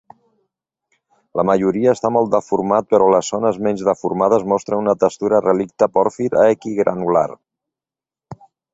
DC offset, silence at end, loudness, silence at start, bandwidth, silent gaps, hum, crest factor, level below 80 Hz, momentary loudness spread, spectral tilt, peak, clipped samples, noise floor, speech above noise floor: under 0.1%; 0.4 s; -17 LUFS; 1.35 s; 8 kHz; none; none; 16 dB; -58 dBFS; 4 LU; -6.5 dB/octave; -2 dBFS; under 0.1%; -90 dBFS; 73 dB